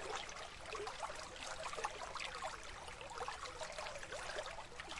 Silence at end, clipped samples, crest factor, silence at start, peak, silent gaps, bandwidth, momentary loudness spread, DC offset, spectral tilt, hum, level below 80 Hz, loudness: 0 s; under 0.1%; 20 dB; 0 s; -28 dBFS; none; 11.5 kHz; 5 LU; under 0.1%; -1.5 dB/octave; none; -62 dBFS; -46 LUFS